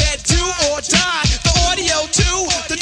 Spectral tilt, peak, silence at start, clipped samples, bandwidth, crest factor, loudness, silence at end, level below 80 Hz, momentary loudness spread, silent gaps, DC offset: -2.5 dB/octave; 0 dBFS; 0 s; under 0.1%; 11 kHz; 16 dB; -15 LUFS; 0 s; -24 dBFS; 3 LU; none; under 0.1%